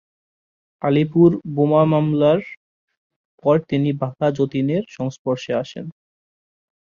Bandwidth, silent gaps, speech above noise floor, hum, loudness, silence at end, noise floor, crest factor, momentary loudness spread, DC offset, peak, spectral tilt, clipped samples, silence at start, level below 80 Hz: 7.2 kHz; 2.57-2.88 s, 2.97-3.10 s, 3.16-3.38 s, 5.19-5.25 s; over 72 dB; none; -19 LUFS; 0.95 s; under -90 dBFS; 18 dB; 11 LU; under 0.1%; -2 dBFS; -8.5 dB/octave; under 0.1%; 0.85 s; -58 dBFS